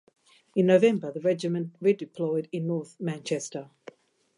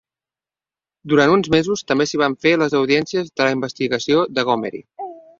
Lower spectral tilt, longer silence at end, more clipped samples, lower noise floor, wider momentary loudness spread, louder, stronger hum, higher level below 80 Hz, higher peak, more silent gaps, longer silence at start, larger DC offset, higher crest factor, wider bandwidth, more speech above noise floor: first, -6.5 dB/octave vs -5 dB/octave; first, 0.7 s vs 0.2 s; neither; second, -51 dBFS vs under -90 dBFS; first, 13 LU vs 9 LU; second, -27 LUFS vs -18 LUFS; neither; second, -80 dBFS vs -56 dBFS; second, -8 dBFS vs -2 dBFS; neither; second, 0.55 s vs 1.05 s; neither; about the same, 20 dB vs 18 dB; first, 11 kHz vs 7.6 kHz; second, 25 dB vs over 72 dB